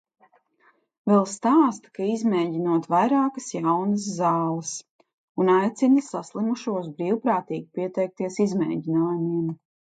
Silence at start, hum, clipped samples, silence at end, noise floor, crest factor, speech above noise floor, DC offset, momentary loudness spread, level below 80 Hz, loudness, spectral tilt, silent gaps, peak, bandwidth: 1.05 s; none; under 0.1%; 0.4 s; -63 dBFS; 16 dB; 40 dB; under 0.1%; 10 LU; -74 dBFS; -24 LUFS; -6.5 dB/octave; 4.90-4.99 s, 5.14-5.35 s; -6 dBFS; 9.4 kHz